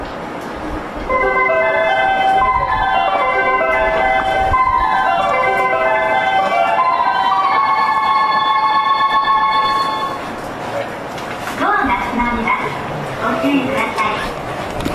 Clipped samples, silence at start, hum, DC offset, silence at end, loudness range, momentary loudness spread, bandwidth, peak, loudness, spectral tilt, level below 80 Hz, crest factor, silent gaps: under 0.1%; 0 s; none; under 0.1%; 0 s; 4 LU; 10 LU; 14 kHz; -4 dBFS; -15 LUFS; -4.5 dB/octave; -36 dBFS; 12 dB; none